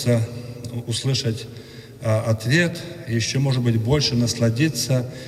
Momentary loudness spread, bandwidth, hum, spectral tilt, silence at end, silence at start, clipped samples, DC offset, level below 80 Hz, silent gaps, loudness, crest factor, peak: 13 LU; 15.5 kHz; none; -5 dB/octave; 0 s; 0 s; under 0.1%; under 0.1%; -50 dBFS; none; -22 LUFS; 16 dB; -4 dBFS